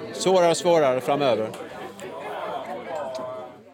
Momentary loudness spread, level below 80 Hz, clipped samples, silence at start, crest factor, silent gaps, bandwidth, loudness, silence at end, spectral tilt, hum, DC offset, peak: 17 LU; -70 dBFS; under 0.1%; 0 s; 16 dB; none; 17 kHz; -23 LUFS; 0.05 s; -4.5 dB/octave; none; under 0.1%; -8 dBFS